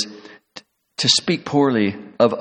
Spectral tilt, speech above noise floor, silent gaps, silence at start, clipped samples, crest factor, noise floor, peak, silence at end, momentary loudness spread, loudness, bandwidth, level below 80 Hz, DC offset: -4 dB/octave; 27 dB; none; 0 s; under 0.1%; 18 dB; -45 dBFS; -2 dBFS; 0 s; 15 LU; -18 LUFS; 11 kHz; -62 dBFS; under 0.1%